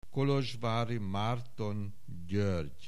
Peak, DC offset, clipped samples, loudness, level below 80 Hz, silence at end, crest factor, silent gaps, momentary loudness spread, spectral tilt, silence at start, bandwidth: -20 dBFS; 1%; under 0.1%; -34 LUFS; -58 dBFS; 0 s; 14 dB; none; 9 LU; -7 dB/octave; 0.15 s; 13 kHz